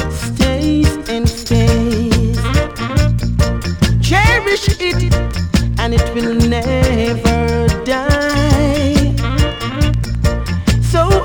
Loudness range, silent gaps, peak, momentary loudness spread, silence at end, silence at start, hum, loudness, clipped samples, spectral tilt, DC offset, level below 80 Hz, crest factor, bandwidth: 1 LU; none; -2 dBFS; 5 LU; 0 s; 0 s; none; -15 LUFS; under 0.1%; -6 dB/octave; under 0.1%; -20 dBFS; 12 dB; 19.5 kHz